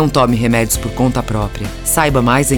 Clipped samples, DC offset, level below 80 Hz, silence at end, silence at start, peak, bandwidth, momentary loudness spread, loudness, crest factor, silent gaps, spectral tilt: under 0.1%; under 0.1%; -28 dBFS; 0 s; 0 s; -2 dBFS; over 20 kHz; 8 LU; -15 LUFS; 12 dB; none; -5 dB/octave